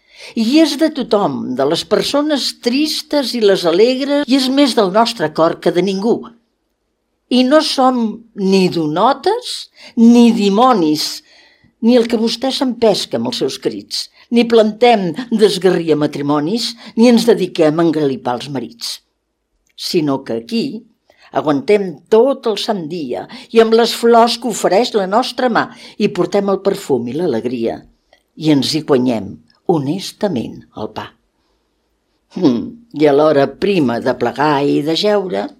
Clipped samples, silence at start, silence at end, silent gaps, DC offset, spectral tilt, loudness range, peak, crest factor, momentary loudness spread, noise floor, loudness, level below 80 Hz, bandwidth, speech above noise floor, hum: under 0.1%; 0.2 s; 0.1 s; none; under 0.1%; -5 dB/octave; 5 LU; 0 dBFS; 14 dB; 12 LU; -68 dBFS; -14 LUFS; -58 dBFS; 15.5 kHz; 54 dB; none